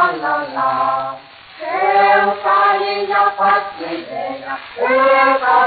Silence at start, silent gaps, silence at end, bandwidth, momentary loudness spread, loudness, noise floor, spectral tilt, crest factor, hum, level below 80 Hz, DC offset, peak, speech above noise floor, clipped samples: 0 s; none; 0 s; 4.8 kHz; 14 LU; -15 LUFS; -36 dBFS; -0.5 dB/octave; 14 dB; none; -60 dBFS; under 0.1%; -2 dBFS; 23 dB; under 0.1%